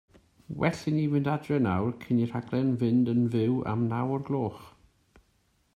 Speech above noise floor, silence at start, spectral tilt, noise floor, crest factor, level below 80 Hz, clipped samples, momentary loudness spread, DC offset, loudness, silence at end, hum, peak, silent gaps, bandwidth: 42 dB; 0.5 s; -8.5 dB/octave; -69 dBFS; 18 dB; -62 dBFS; under 0.1%; 5 LU; under 0.1%; -28 LUFS; 1.05 s; none; -10 dBFS; none; 10 kHz